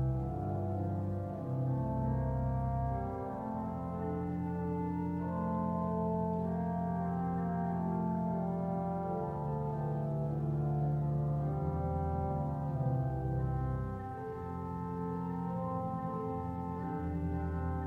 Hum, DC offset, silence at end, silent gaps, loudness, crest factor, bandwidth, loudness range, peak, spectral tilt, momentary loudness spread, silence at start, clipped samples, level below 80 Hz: none; under 0.1%; 0 s; none; -36 LUFS; 12 dB; 3.4 kHz; 3 LU; -22 dBFS; -11 dB/octave; 5 LU; 0 s; under 0.1%; -48 dBFS